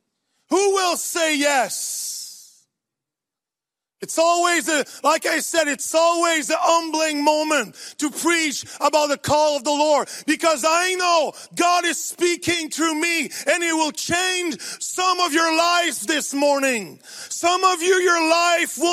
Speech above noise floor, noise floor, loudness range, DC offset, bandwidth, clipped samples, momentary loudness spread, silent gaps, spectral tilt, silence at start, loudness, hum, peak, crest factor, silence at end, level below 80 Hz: 68 dB; -88 dBFS; 4 LU; under 0.1%; 15.5 kHz; under 0.1%; 8 LU; none; -1.5 dB/octave; 0.5 s; -19 LUFS; none; -2 dBFS; 18 dB; 0 s; -64 dBFS